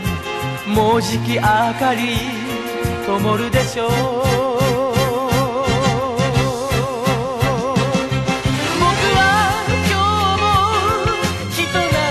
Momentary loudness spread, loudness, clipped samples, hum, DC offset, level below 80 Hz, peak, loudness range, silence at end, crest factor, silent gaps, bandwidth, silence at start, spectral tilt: 5 LU; -17 LUFS; under 0.1%; none; under 0.1%; -34 dBFS; -2 dBFS; 3 LU; 0 s; 16 dB; none; 13.5 kHz; 0 s; -5 dB/octave